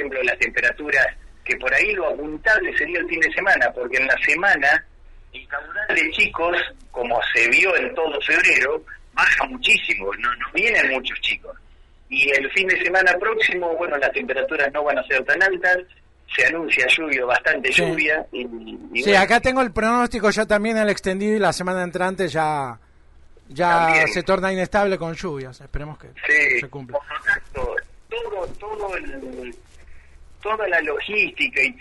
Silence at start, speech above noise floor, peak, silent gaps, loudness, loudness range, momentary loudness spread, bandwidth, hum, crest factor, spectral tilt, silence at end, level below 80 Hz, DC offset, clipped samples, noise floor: 0 s; 28 dB; -6 dBFS; none; -19 LUFS; 5 LU; 14 LU; 11.5 kHz; none; 16 dB; -3.5 dB/octave; 0.05 s; -44 dBFS; under 0.1%; under 0.1%; -48 dBFS